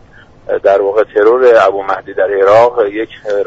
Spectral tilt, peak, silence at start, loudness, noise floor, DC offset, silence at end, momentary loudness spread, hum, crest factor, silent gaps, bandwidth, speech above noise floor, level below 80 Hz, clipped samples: -5.5 dB/octave; 0 dBFS; 0.5 s; -11 LUFS; -32 dBFS; under 0.1%; 0 s; 10 LU; none; 10 dB; none; 7.8 kHz; 22 dB; -48 dBFS; under 0.1%